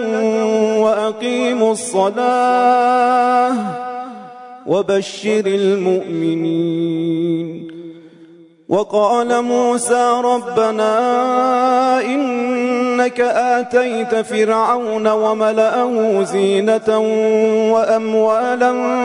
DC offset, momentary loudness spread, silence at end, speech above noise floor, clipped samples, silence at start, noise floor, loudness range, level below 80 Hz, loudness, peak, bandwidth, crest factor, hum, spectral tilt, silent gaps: under 0.1%; 6 LU; 0 s; 29 dB; under 0.1%; 0 s; -44 dBFS; 4 LU; -66 dBFS; -16 LUFS; -2 dBFS; 11 kHz; 12 dB; none; -5 dB/octave; none